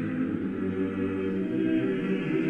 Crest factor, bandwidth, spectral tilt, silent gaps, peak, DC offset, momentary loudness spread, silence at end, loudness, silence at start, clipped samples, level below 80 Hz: 12 dB; 5.2 kHz; -9 dB/octave; none; -16 dBFS; under 0.1%; 4 LU; 0 s; -29 LUFS; 0 s; under 0.1%; -58 dBFS